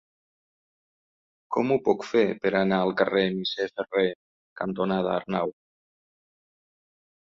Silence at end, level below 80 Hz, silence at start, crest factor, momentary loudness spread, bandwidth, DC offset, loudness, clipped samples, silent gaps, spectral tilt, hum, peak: 1.7 s; -66 dBFS; 1.5 s; 20 dB; 8 LU; 7.4 kHz; under 0.1%; -26 LUFS; under 0.1%; 4.15-4.56 s; -6.5 dB/octave; none; -8 dBFS